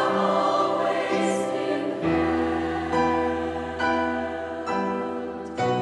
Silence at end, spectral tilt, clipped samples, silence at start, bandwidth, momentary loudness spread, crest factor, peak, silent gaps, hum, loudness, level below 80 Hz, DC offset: 0 s; -5.5 dB/octave; under 0.1%; 0 s; 11.5 kHz; 7 LU; 14 dB; -10 dBFS; none; none; -25 LUFS; -50 dBFS; under 0.1%